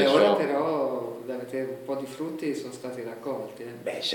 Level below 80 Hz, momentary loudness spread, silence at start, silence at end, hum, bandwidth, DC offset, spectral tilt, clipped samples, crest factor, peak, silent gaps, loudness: -80 dBFS; 14 LU; 0 s; 0 s; none; 17 kHz; under 0.1%; -5 dB/octave; under 0.1%; 20 dB; -8 dBFS; none; -29 LUFS